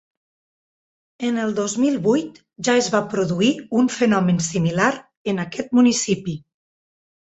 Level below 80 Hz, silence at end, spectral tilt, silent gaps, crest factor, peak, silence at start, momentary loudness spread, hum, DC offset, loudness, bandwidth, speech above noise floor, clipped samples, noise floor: -60 dBFS; 0.9 s; -5 dB/octave; 5.17-5.25 s; 18 dB; -4 dBFS; 1.2 s; 9 LU; none; under 0.1%; -20 LUFS; 8.2 kHz; over 70 dB; under 0.1%; under -90 dBFS